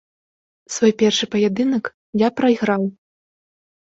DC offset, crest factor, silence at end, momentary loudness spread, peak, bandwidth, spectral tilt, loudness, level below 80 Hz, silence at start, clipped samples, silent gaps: under 0.1%; 18 dB; 1.1 s; 9 LU; -4 dBFS; 8 kHz; -4.5 dB/octave; -19 LUFS; -62 dBFS; 0.7 s; under 0.1%; 1.94-2.13 s